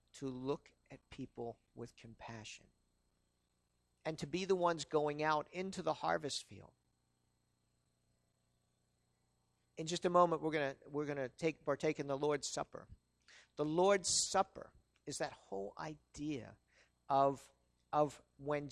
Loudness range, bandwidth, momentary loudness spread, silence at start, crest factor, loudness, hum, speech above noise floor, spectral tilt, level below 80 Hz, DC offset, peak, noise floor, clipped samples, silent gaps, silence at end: 12 LU; 13 kHz; 20 LU; 0.15 s; 24 dB; -38 LUFS; 60 Hz at -75 dBFS; 43 dB; -4 dB/octave; -72 dBFS; under 0.1%; -16 dBFS; -82 dBFS; under 0.1%; none; 0 s